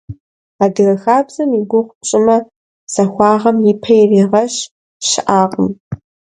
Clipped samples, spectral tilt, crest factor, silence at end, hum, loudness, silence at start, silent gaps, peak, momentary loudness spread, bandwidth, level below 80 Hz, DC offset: under 0.1%; -5 dB/octave; 14 dB; 0.35 s; none; -13 LUFS; 0.1 s; 0.20-0.59 s, 1.95-2.01 s, 2.56-2.87 s, 4.71-5.00 s, 5.80-5.91 s; 0 dBFS; 10 LU; 11 kHz; -52 dBFS; under 0.1%